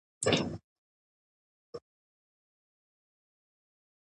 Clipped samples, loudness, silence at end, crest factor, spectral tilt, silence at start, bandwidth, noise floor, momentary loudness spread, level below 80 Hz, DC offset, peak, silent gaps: under 0.1%; -31 LUFS; 2.35 s; 30 dB; -4 dB/octave; 0.2 s; 11 kHz; under -90 dBFS; 20 LU; -64 dBFS; under 0.1%; -12 dBFS; 0.64-1.73 s